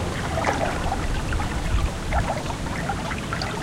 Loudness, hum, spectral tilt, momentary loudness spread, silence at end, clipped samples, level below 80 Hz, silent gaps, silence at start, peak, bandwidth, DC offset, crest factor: -26 LUFS; none; -5 dB/octave; 4 LU; 0 s; under 0.1%; -30 dBFS; none; 0 s; -8 dBFS; 16 kHz; under 0.1%; 18 dB